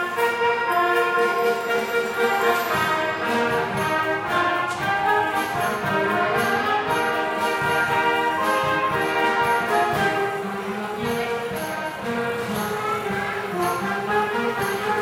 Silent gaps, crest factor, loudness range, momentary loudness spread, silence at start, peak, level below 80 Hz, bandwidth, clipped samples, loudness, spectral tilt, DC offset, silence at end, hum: none; 14 dB; 4 LU; 6 LU; 0 s; -8 dBFS; -56 dBFS; 16 kHz; under 0.1%; -22 LUFS; -4 dB/octave; under 0.1%; 0 s; none